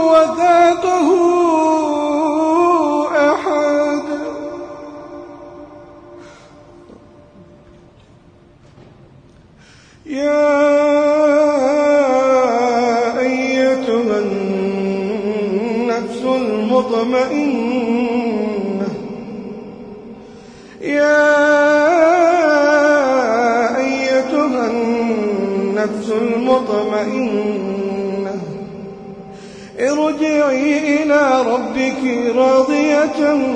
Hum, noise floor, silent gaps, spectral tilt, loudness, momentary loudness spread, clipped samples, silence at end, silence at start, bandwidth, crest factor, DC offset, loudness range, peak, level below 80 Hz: none; -46 dBFS; none; -5 dB/octave; -15 LUFS; 17 LU; under 0.1%; 0 s; 0 s; 9.8 kHz; 14 dB; under 0.1%; 8 LU; -2 dBFS; -54 dBFS